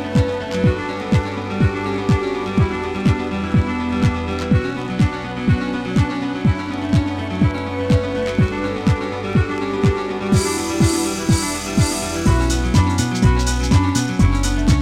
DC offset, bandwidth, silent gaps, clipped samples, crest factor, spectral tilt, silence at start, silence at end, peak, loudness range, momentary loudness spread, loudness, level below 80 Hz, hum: under 0.1%; 16 kHz; none; under 0.1%; 16 dB; -6 dB/octave; 0 s; 0 s; -2 dBFS; 2 LU; 4 LU; -19 LUFS; -28 dBFS; none